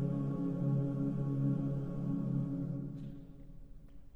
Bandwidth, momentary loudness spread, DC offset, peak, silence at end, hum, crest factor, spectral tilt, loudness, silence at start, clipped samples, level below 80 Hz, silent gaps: 3.4 kHz; 17 LU; under 0.1%; -22 dBFS; 0 s; none; 14 dB; -11.5 dB/octave; -36 LUFS; 0 s; under 0.1%; -54 dBFS; none